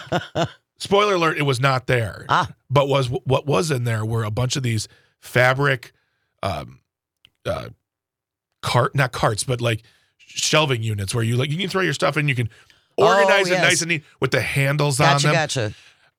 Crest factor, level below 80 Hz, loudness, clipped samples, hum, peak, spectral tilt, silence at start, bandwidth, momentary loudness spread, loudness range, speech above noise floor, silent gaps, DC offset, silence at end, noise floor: 20 dB; -54 dBFS; -20 LUFS; under 0.1%; none; -2 dBFS; -4.5 dB/octave; 0 s; 15.5 kHz; 12 LU; 6 LU; 66 dB; none; under 0.1%; 0.45 s; -86 dBFS